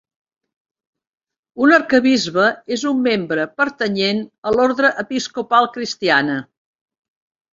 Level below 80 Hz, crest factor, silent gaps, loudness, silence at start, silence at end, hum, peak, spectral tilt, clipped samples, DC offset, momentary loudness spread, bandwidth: -58 dBFS; 18 dB; 4.38-4.42 s; -17 LUFS; 1.55 s; 1.1 s; none; -2 dBFS; -4 dB/octave; under 0.1%; under 0.1%; 9 LU; 7.8 kHz